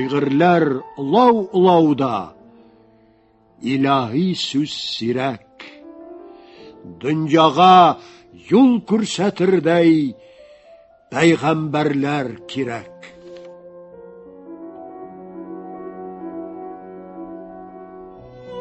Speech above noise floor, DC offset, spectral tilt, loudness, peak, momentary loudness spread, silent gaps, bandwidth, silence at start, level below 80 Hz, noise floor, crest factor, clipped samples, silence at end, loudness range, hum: 38 dB; under 0.1%; -6 dB/octave; -17 LUFS; -2 dBFS; 24 LU; none; 8.6 kHz; 0 s; -60 dBFS; -55 dBFS; 18 dB; under 0.1%; 0 s; 19 LU; none